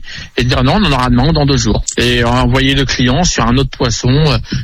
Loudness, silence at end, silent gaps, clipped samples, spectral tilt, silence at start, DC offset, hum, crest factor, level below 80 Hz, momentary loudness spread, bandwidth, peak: -12 LUFS; 0 s; none; under 0.1%; -5 dB/octave; 0 s; under 0.1%; none; 10 dB; -22 dBFS; 3 LU; 13 kHz; 0 dBFS